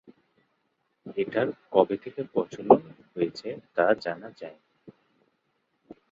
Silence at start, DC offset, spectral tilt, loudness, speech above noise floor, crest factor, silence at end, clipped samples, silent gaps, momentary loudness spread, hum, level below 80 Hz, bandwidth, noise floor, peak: 1.05 s; under 0.1%; -7 dB/octave; -27 LUFS; 49 dB; 26 dB; 1.2 s; under 0.1%; none; 21 LU; none; -72 dBFS; 7.6 kHz; -75 dBFS; -2 dBFS